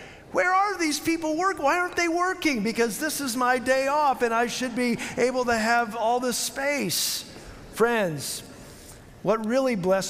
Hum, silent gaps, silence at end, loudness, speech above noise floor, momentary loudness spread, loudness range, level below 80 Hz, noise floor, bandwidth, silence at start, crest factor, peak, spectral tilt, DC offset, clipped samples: none; none; 0 s; -24 LUFS; 21 dB; 9 LU; 3 LU; -56 dBFS; -46 dBFS; 16 kHz; 0 s; 16 dB; -10 dBFS; -3 dB/octave; under 0.1%; under 0.1%